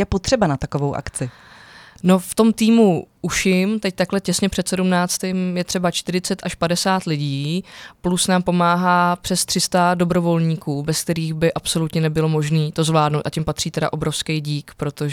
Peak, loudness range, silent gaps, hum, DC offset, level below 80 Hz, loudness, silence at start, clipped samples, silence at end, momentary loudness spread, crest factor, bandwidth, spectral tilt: -2 dBFS; 3 LU; none; none; under 0.1%; -44 dBFS; -19 LUFS; 0 s; under 0.1%; 0 s; 8 LU; 18 dB; 17 kHz; -5 dB/octave